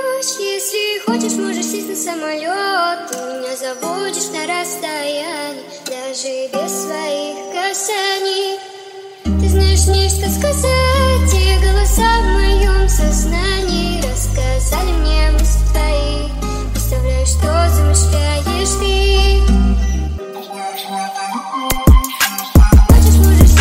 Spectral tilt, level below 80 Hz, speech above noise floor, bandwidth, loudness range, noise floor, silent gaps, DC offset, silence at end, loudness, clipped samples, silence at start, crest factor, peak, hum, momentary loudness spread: -4.5 dB/octave; -16 dBFS; 17 dB; 16.5 kHz; 7 LU; -33 dBFS; none; under 0.1%; 0 s; -15 LUFS; under 0.1%; 0 s; 14 dB; 0 dBFS; none; 11 LU